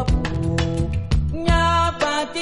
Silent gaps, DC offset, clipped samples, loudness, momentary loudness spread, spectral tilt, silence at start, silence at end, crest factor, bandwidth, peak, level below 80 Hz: none; under 0.1%; under 0.1%; -21 LUFS; 5 LU; -5.5 dB/octave; 0 s; 0 s; 16 dB; 11.5 kHz; -4 dBFS; -26 dBFS